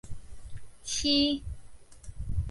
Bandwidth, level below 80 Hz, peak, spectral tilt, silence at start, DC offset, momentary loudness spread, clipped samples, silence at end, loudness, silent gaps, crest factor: 11.5 kHz; -42 dBFS; -12 dBFS; -4 dB/octave; 0.05 s; under 0.1%; 25 LU; under 0.1%; 0 s; -28 LUFS; none; 20 dB